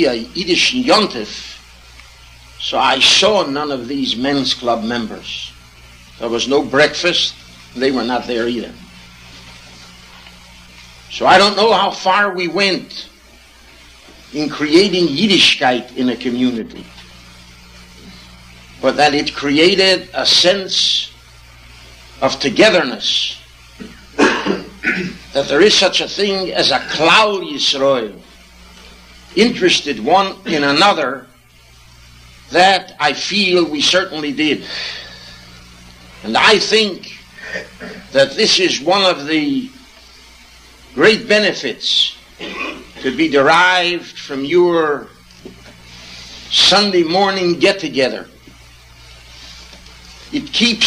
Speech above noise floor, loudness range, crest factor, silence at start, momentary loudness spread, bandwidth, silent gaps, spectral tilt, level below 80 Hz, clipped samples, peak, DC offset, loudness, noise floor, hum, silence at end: 31 dB; 4 LU; 16 dB; 0 s; 18 LU; 14.5 kHz; none; -3 dB/octave; -46 dBFS; under 0.1%; 0 dBFS; under 0.1%; -14 LUFS; -46 dBFS; none; 0 s